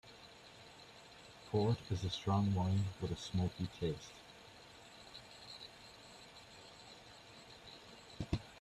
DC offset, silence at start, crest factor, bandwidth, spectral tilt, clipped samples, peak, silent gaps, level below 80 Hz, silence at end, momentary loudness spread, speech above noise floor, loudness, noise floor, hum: under 0.1%; 0.05 s; 20 dB; 12 kHz; -6.5 dB/octave; under 0.1%; -22 dBFS; none; -62 dBFS; 0 s; 20 LU; 21 dB; -39 LUFS; -58 dBFS; none